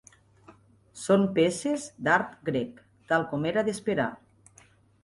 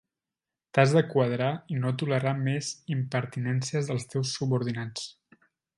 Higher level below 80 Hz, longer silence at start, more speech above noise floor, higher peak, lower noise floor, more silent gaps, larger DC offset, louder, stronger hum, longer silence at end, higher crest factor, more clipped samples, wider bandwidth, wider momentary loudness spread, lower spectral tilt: about the same, -66 dBFS vs -68 dBFS; second, 0.5 s vs 0.75 s; second, 33 dB vs 63 dB; about the same, -8 dBFS vs -6 dBFS; second, -59 dBFS vs -90 dBFS; neither; neither; about the same, -27 LUFS vs -28 LUFS; neither; first, 0.9 s vs 0.65 s; about the same, 20 dB vs 24 dB; neither; about the same, 11.5 kHz vs 11.5 kHz; about the same, 8 LU vs 10 LU; about the same, -5.5 dB/octave vs -6 dB/octave